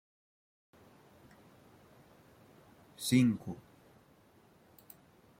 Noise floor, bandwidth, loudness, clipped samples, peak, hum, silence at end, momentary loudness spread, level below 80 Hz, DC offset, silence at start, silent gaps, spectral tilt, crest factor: -64 dBFS; 16.5 kHz; -32 LUFS; under 0.1%; -16 dBFS; none; 1.85 s; 29 LU; -74 dBFS; under 0.1%; 3 s; none; -5.5 dB/octave; 24 dB